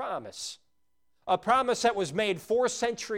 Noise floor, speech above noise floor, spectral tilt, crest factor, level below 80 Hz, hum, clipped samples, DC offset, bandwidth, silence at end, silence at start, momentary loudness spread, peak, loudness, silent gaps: -80 dBFS; 52 dB; -3 dB/octave; 18 dB; -64 dBFS; none; under 0.1%; under 0.1%; 16.5 kHz; 0 s; 0 s; 14 LU; -12 dBFS; -28 LUFS; none